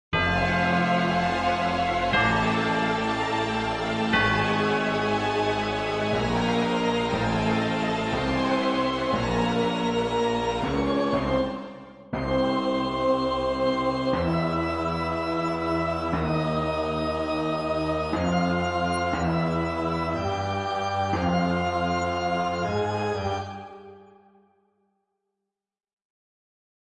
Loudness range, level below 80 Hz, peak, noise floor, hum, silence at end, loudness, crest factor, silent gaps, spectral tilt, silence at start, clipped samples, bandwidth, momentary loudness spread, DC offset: 3 LU; -46 dBFS; -10 dBFS; -88 dBFS; none; 2.85 s; -25 LUFS; 16 dB; none; -6 dB/octave; 0.1 s; under 0.1%; 11 kHz; 4 LU; under 0.1%